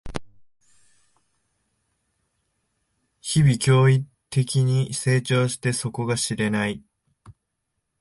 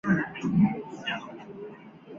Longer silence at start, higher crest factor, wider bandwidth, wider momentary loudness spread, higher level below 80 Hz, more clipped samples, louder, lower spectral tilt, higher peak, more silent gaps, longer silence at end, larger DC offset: about the same, 0.05 s vs 0.05 s; about the same, 16 dB vs 18 dB; first, 11.5 kHz vs 7.2 kHz; second, 11 LU vs 19 LU; first, -52 dBFS vs -58 dBFS; neither; first, -22 LUFS vs -28 LUFS; second, -5.5 dB/octave vs -7.5 dB/octave; first, -8 dBFS vs -12 dBFS; neither; first, 0.7 s vs 0 s; neither